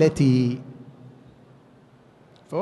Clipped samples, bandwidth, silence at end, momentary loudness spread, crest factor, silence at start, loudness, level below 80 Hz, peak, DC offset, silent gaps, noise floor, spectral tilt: under 0.1%; 11.5 kHz; 0 s; 26 LU; 18 dB; 0 s; -22 LUFS; -56 dBFS; -6 dBFS; under 0.1%; none; -53 dBFS; -7.5 dB/octave